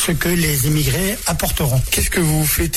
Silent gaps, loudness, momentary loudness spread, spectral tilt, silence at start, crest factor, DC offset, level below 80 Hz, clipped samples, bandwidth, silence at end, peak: none; -17 LUFS; 3 LU; -4 dB/octave; 0 s; 12 dB; under 0.1%; -26 dBFS; under 0.1%; 18 kHz; 0 s; -6 dBFS